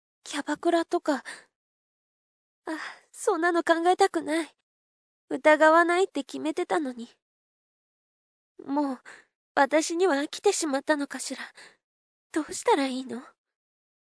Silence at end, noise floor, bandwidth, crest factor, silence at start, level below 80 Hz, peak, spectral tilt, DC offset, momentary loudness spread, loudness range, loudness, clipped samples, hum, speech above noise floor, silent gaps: 0.9 s; under -90 dBFS; 11 kHz; 22 dB; 0.25 s; -80 dBFS; -6 dBFS; -2 dB/octave; under 0.1%; 18 LU; 8 LU; -26 LUFS; under 0.1%; none; over 64 dB; 1.55-2.62 s, 4.63-5.28 s, 7.22-8.55 s, 9.35-9.55 s, 11.84-12.30 s